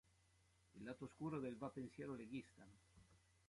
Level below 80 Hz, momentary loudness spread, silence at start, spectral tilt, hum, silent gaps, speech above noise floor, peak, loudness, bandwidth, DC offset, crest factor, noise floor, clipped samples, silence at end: -78 dBFS; 19 LU; 0.75 s; -7 dB/octave; none; none; 25 dB; -36 dBFS; -52 LUFS; 11.5 kHz; under 0.1%; 18 dB; -77 dBFS; under 0.1%; 0.3 s